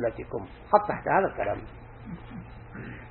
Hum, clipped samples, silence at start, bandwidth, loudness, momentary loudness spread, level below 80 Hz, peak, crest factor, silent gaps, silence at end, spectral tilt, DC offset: none; under 0.1%; 0 s; 4.3 kHz; -27 LUFS; 19 LU; -50 dBFS; -4 dBFS; 24 dB; none; 0 s; -10.5 dB/octave; under 0.1%